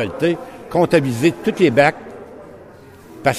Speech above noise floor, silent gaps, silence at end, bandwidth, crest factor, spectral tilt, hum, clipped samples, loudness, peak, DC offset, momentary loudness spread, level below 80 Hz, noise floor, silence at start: 25 dB; none; 0 s; 14.5 kHz; 18 dB; -6 dB/octave; none; under 0.1%; -17 LUFS; 0 dBFS; under 0.1%; 22 LU; -52 dBFS; -41 dBFS; 0 s